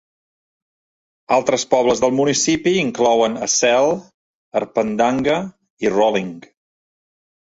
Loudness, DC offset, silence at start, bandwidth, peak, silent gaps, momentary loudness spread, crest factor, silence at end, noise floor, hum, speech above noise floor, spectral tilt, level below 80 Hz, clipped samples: -18 LUFS; under 0.1%; 1.3 s; 8 kHz; -2 dBFS; 4.14-4.51 s, 5.70-5.77 s; 9 LU; 16 dB; 1.15 s; under -90 dBFS; none; over 73 dB; -3.5 dB/octave; -56 dBFS; under 0.1%